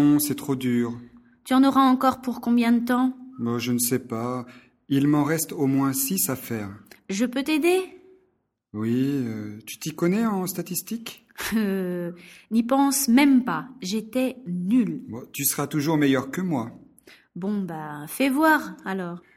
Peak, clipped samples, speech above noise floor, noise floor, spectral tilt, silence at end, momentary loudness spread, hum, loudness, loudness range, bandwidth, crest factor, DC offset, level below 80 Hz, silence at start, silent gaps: -6 dBFS; under 0.1%; 47 dB; -70 dBFS; -4.5 dB/octave; 0.15 s; 15 LU; none; -24 LUFS; 5 LU; 16.5 kHz; 18 dB; under 0.1%; -62 dBFS; 0 s; none